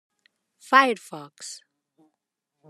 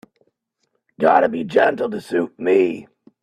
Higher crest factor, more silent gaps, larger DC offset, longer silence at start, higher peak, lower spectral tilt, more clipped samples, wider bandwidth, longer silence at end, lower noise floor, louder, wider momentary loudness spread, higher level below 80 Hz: about the same, 24 dB vs 20 dB; neither; neither; second, 0.7 s vs 1 s; second, -4 dBFS vs 0 dBFS; second, -2.5 dB/octave vs -6.5 dB/octave; neither; first, 13.5 kHz vs 11 kHz; first, 1.15 s vs 0.4 s; first, -82 dBFS vs -72 dBFS; about the same, -20 LUFS vs -18 LUFS; first, 22 LU vs 8 LU; second, under -90 dBFS vs -66 dBFS